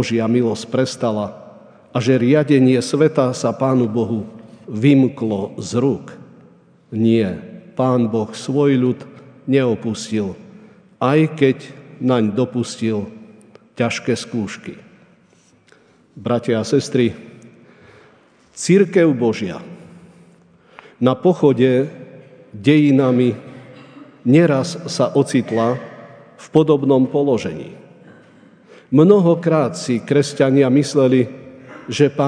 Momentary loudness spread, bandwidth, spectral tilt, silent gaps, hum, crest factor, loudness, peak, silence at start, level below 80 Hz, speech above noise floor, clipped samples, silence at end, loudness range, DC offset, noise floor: 15 LU; 10 kHz; -6.5 dB/octave; none; none; 18 dB; -17 LUFS; 0 dBFS; 0 s; -62 dBFS; 38 dB; under 0.1%; 0 s; 7 LU; under 0.1%; -54 dBFS